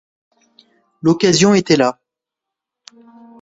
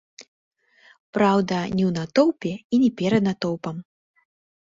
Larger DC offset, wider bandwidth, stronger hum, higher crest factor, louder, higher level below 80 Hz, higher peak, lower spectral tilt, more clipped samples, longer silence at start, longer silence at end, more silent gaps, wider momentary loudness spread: neither; about the same, 8 kHz vs 7.8 kHz; neither; about the same, 18 dB vs 20 dB; first, -14 LUFS vs -22 LUFS; about the same, -56 dBFS vs -58 dBFS; first, 0 dBFS vs -4 dBFS; second, -4.5 dB/octave vs -7 dB/octave; neither; first, 1.05 s vs 0.2 s; first, 1.5 s vs 0.85 s; second, none vs 0.28-0.51 s, 1.00-1.13 s, 2.64-2.70 s; second, 7 LU vs 11 LU